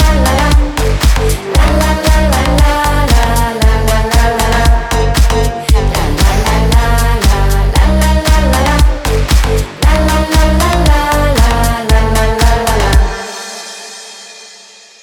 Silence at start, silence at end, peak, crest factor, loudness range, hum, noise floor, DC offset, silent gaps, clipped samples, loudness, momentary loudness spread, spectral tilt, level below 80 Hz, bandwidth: 0 s; 0.55 s; 0 dBFS; 10 dB; 1 LU; none; -37 dBFS; under 0.1%; none; under 0.1%; -11 LUFS; 5 LU; -5 dB/octave; -12 dBFS; 18.5 kHz